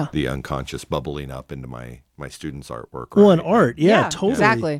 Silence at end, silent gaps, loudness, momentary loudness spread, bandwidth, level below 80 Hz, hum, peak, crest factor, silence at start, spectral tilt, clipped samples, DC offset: 0 s; none; -18 LUFS; 21 LU; 14.5 kHz; -44 dBFS; none; -2 dBFS; 16 dB; 0 s; -6 dB/octave; under 0.1%; under 0.1%